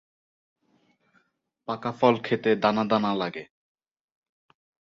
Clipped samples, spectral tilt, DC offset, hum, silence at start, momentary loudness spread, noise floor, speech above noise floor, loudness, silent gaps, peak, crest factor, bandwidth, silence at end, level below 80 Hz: under 0.1%; -7 dB/octave; under 0.1%; none; 1.7 s; 12 LU; -70 dBFS; 46 dB; -25 LUFS; none; -6 dBFS; 24 dB; 7 kHz; 1.45 s; -70 dBFS